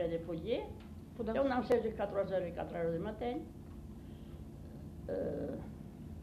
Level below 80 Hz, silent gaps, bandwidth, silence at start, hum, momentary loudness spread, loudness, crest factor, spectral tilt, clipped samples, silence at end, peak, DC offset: -54 dBFS; none; 14 kHz; 0 s; none; 17 LU; -38 LUFS; 18 dB; -7.5 dB/octave; under 0.1%; 0 s; -20 dBFS; under 0.1%